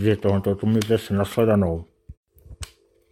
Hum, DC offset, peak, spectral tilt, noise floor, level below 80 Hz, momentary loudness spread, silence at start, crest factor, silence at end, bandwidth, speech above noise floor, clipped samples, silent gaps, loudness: none; under 0.1%; -6 dBFS; -7 dB/octave; -41 dBFS; -46 dBFS; 20 LU; 0 s; 16 dB; 0.45 s; 16 kHz; 20 dB; under 0.1%; 2.17-2.23 s; -22 LUFS